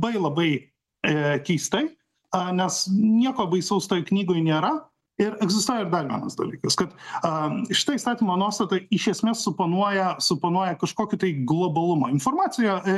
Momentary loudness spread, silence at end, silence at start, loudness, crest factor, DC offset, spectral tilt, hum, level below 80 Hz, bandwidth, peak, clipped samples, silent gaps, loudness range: 6 LU; 0 s; 0 s; -24 LUFS; 16 dB; under 0.1%; -4.5 dB/octave; none; -64 dBFS; 12.5 kHz; -6 dBFS; under 0.1%; none; 2 LU